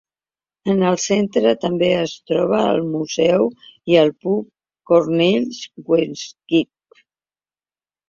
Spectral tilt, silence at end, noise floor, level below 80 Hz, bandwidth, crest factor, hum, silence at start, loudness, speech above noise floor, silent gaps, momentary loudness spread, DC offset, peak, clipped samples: -5.5 dB/octave; 1.45 s; under -90 dBFS; -60 dBFS; 7.6 kHz; 16 dB; none; 0.65 s; -18 LUFS; over 72 dB; none; 11 LU; under 0.1%; -2 dBFS; under 0.1%